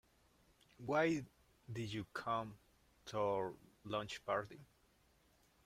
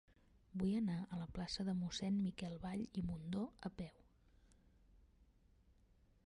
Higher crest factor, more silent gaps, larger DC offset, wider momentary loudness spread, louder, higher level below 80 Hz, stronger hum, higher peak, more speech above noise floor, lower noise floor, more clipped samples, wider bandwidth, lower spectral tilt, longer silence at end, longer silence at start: first, 20 dB vs 14 dB; neither; neither; first, 19 LU vs 10 LU; about the same, -42 LUFS vs -44 LUFS; second, -72 dBFS vs -64 dBFS; neither; first, -24 dBFS vs -30 dBFS; first, 33 dB vs 29 dB; about the same, -74 dBFS vs -72 dBFS; neither; first, 16 kHz vs 11.5 kHz; about the same, -5.5 dB/octave vs -6.5 dB/octave; second, 1 s vs 1.3 s; first, 0.8 s vs 0.5 s